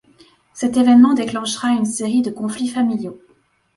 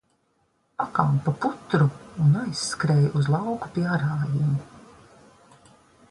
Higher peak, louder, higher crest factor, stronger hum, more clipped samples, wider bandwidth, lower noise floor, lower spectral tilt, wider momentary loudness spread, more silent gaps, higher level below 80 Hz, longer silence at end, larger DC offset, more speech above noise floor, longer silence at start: first, -2 dBFS vs -6 dBFS; first, -17 LUFS vs -24 LUFS; about the same, 16 dB vs 20 dB; neither; neither; about the same, 11.5 kHz vs 11.5 kHz; second, -52 dBFS vs -69 dBFS; second, -4.5 dB/octave vs -6.5 dB/octave; first, 12 LU vs 7 LU; neither; about the same, -60 dBFS vs -58 dBFS; second, 0.6 s vs 1.3 s; neither; second, 35 dB vs 46 dB; second, 0.55 s vs 0.8 s